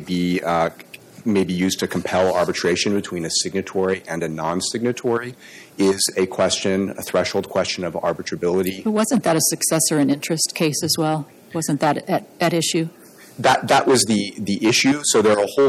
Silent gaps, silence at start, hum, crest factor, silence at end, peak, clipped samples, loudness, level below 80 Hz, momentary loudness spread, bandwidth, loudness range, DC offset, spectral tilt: none; 0 s; none; 14 dB; 0 s; -6 dBFS; under 0.1%; -20 LUFS; -58 dBFS; 8 LU; 17 kHz; 3 LU; under 0.1%; -3.5 dB/octave